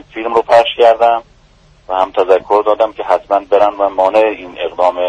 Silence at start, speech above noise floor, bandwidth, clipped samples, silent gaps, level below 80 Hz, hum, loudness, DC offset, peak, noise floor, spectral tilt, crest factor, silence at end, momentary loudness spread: 0.15 s; 35 dB; 9.6 kHz; under 0.1%; none; -48 dBFS; none; -13 LUFS; under 0.1%; 0 dBFS; -47 dBFS; -4.5 dB/octave; 12 dB; 0 s; 7 LU